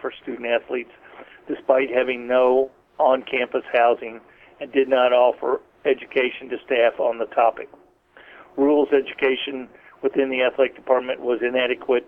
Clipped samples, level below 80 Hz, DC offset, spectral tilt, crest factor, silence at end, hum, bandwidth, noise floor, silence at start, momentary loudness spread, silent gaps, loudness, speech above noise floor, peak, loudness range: under 0.1%; -64 dBFS; under 0.1%; -6.5 dB/octave; 18 dB; 0.05 s; none; 4.1 kHz; -51 dBFS; 0.05 s; 13 LU; none; -21 LUFS; 30 dB; -4 dBFS; 2 LU